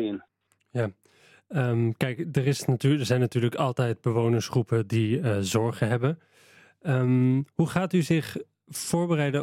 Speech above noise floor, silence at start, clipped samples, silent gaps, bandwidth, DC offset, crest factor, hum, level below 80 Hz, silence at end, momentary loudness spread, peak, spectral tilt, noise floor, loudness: 34 dB; 0 s; under 0.1%; none; 15.5 kHz; under 0.1%; 16 dB; none; -64 dBFS; 0 s; 9 LU; -10 dBFS; -6.5 dB/octave; -59 dBFS; -26 LUFS